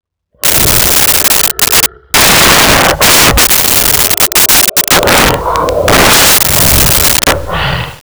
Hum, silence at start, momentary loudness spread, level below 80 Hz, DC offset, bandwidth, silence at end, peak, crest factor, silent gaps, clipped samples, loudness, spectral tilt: none; 0.45 s; 7 LU; -24 dBFS; under 0.1%; over 20 kHz; 0.1 s; 0 dBFS; 8 dB; none; 0.2%; -5 LUFS; -1.5 dB/octave